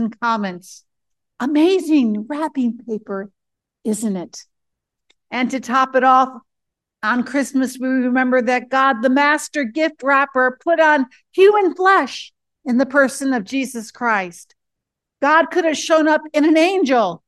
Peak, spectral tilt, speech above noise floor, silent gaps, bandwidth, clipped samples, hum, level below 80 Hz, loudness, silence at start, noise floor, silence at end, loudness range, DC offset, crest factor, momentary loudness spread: -2 dBFS; -4 dB/octave; 64 dB; none; 12.5 kHz; under 0.1%; none; -72 dBFS; -17 LUFS; 0 s; -81 dBFS; 0.1 s; 6 LU; under 0.1%; 16 dB; 12 LU